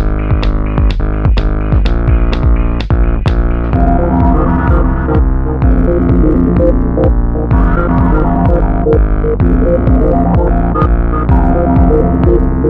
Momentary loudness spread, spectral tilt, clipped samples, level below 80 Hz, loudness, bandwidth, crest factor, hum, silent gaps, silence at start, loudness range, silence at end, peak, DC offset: 4 LU; -10.5 dB/octave; under 0.1%; -12 dBFS; -12 LUFS; 5.4 kHz; 10 dB; none; none; 0 s; 2 LU; 0 s; 0 dBFS; 2%